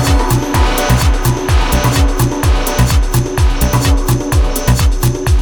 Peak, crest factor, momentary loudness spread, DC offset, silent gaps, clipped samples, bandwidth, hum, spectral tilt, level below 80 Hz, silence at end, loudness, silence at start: 0 dBFS; 12 dB; 2 LU; under 0.1%; none; under 0.1%; 19.5 kHz; none; -5 dB/octave; -14 dBFS; 0 s; -13 LUFS; 0 s